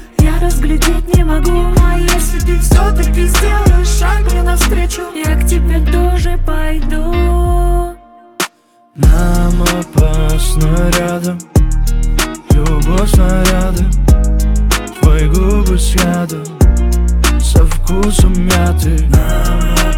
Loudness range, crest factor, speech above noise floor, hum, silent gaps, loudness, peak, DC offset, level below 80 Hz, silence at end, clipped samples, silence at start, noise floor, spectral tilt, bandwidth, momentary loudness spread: 3 LU; 10 dB; 34 dB; none; none; -13 LUFS; 0 dBFS; under 0.1%; -12 dBFS; 0 s; under 0.1%; 0 s; -44 dBFS; -5.5 dB/octave; 17 kHz; 6 LU